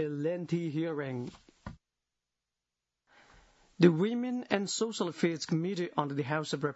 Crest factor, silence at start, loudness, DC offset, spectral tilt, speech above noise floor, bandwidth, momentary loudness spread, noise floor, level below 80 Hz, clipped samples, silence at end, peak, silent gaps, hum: 24 dB; 0 s; -32 LUFS; under 0.1%; -5.5 dB/octave; 58 dB; 8 kHz; 17 LU; -89 dBFS; -68 dBFS; under 0.1%; 0 s; -8 dBFS; none; 60 Hz at -55 dBFS